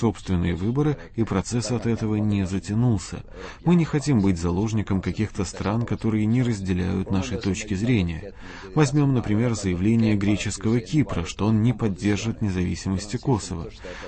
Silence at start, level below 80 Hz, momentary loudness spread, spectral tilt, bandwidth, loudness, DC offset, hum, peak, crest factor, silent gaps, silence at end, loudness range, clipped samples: 0 s; -42 dBFS; 7 LU; -6.5 dB/octave; 8.8 kHz; -24 LUFS; under 0.1%; none; -6 dBFS; 18 dB; none; 0 s; 2 LU; under 0.1%